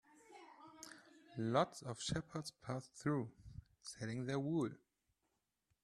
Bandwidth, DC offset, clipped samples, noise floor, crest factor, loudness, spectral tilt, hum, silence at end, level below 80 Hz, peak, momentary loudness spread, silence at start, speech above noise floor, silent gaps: 13 kHz; under 0.1%; under 0.1%; -86 dBFS; 24 dB; -42 LUFS; -5.5 dB/octave; none; 1.1 s; -70 dBFS; -20 dBFS; 22 LU; 0.3 s; 45 dB; none